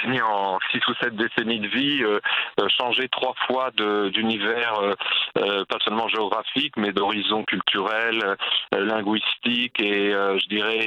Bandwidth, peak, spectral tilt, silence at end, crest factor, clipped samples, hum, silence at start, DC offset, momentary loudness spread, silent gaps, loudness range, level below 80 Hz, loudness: 9.2 kHz; -2 dBFS; -5.5 dB/octave; 0 s; 22 dB; under 0.1%; none; 0 s; under 0.1%; 3 LU; none; 1 LU; -70 dBFS; -22 LUFS